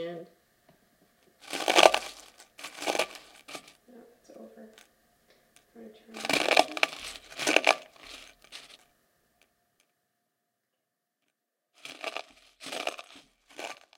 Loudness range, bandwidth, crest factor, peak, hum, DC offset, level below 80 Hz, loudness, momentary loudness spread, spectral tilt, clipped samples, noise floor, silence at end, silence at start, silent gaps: 16 LU; 17 kHz; 34 dB; 0 dBFS; none; under 0.1%; -72 dBFS; -27 LUFS; 25 LU; -1 dB/octave; under 0.1%; -83 dBFS; 0.25 s; 0 s; none